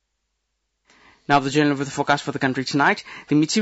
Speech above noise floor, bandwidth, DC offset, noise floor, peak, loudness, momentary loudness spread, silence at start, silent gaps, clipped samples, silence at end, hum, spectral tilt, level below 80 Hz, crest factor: 55 dB; 8 kHz; under 0.1%; -75 dBFS; -6 dBFS; -21 LUFS; 5 LU; 1.3 s; none; under 0.1%; 0 s; none; -4.5 dB/octave; -60 dBFS; 16 dB